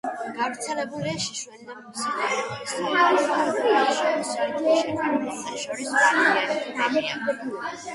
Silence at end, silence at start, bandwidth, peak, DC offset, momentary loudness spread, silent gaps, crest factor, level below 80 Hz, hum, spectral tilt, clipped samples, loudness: 0 s; 0.05 s; 11.5 kHz; -6 dBFS; under 0.1%; 12 LU; none; 18 dB; -68 dBFS; none; -3 dB/octave; under 0.1%; -24 LUFS